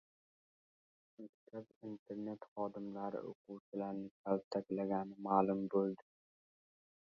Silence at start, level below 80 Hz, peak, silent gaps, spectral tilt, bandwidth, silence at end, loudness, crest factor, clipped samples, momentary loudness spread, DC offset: 1.2 s; -82 dBFS; -16 dBFS; 1.29-1.47 s, 1.76-1.81 s, 1.99-2.06 s, 2.48-2.56 s, 3.35-3.45 s, 3.60-3.72 s, 4.11-4.24 s, 4.44-4.51 s; -7.5 dB/octave; 6.8 kHz; 1 s; -41 LUFS; 26 dB; under 0.1%; 18 LU; under 0.1%